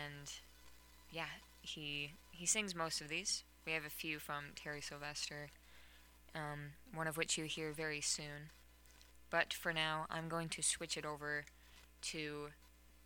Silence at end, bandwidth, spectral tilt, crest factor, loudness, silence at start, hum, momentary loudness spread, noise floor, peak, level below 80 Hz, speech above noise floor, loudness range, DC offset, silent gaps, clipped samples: 0 s; 19 kHz; -2 dB/octave; 26 dB; -42 LUFS; 0 s; 60 Hz at -70 dBFS; 14 LU; -64 dBFS; -18 dBFS; -68 dBFS; 20 dB; 4 LU; under 0.1%; none; under 0.1%